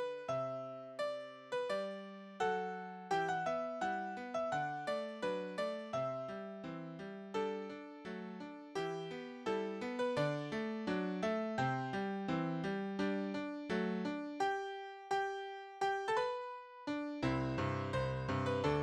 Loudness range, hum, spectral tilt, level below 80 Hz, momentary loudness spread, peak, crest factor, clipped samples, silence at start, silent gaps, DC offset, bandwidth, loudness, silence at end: 5 LU; none; -6.5 dB/octave; -66 dBFS; 10 LU; -22 dBFS; 18 dB; under 0.1%; 0 s; none; under 0.1%; 11.5 kHz; -40 LUFS; 0 s